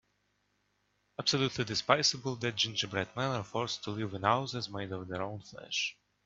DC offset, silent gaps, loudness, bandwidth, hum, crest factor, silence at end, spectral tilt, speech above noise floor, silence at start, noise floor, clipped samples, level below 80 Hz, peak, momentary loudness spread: under 0.1%; none; -33 LUFS; 8 kHz; 50 Hz at -60 dBFS; 28 dB; 0.35 s; -3.5 dB/octave; 43 dB; 1.2 s; -77 dBFS; under 0.1%; -70 dBFS; -6 dBFS; 11 LU